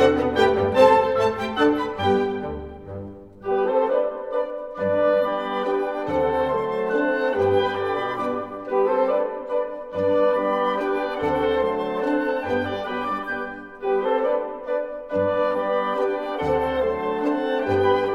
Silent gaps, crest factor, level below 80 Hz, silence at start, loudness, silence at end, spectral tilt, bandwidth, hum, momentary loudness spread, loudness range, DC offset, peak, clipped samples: none; 20 dB; -50 dBFS; 0 s; -23 LUFS; 0 s; -6.5 dB/octave; 11.5 kHz; none; 8 LU; 3 LU; 0.1%; -4 dBFS; under 0.1%